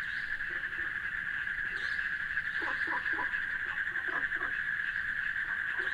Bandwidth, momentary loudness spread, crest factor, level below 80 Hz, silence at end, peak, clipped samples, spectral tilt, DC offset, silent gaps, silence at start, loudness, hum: 15 kHz; 3 LU; 14 dB; -58 dBFS; 0 s; -20 dBFS; under 0.1%; -3 dB/octave; under 0.1%; none; 0 s; -33 LUFS; none